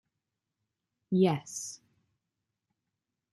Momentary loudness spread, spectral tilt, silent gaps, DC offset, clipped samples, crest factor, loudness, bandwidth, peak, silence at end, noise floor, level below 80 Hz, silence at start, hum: 16 LU; -6 dB/octave; none; under 0.1%; under 0.1%; 22 dB; -30 LUFS; 12.5 kHz; -14 dBFS; 1.6 s; -87 dBFS; -78 dBFS; 1.1 s; none